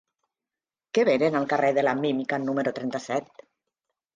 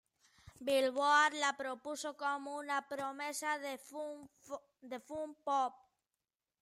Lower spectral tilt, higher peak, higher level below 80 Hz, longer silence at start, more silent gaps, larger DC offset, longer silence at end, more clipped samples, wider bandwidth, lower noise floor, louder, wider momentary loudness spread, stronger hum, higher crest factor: first, -5.5 dB/octave vs -1.5 dB/octave; first, -10 dBFS vs -18 dBFS; first, -72 dBFS vs -80 dBFS; first, 0.95 s vs 0.45 s; neither; neither; about the same, 0.9 s vs 0.9 s; neither; second, 9.4 kHz vs 16 kHz; about the same, under -90 dBFS vs under -90 dBFS; first, -25 LUFS vs -37 LUFS; second, 9 LU vs 19 LU; neither; about the same, 18 dB vs 20 dB